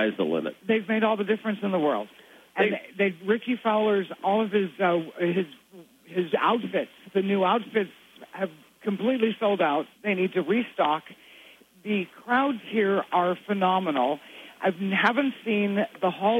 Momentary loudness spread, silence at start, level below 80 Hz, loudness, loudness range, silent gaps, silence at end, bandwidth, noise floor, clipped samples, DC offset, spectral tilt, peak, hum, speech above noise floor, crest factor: 8 LU; 0 s; -80 dBFS; -26 LUFS; 2 LU; none; 0 s; 15.5 kHz; -53 dBFS; under 0.1%; under 0.1%; -7 dB/octave; -8 dBFS; none; 28 dB; 18 dB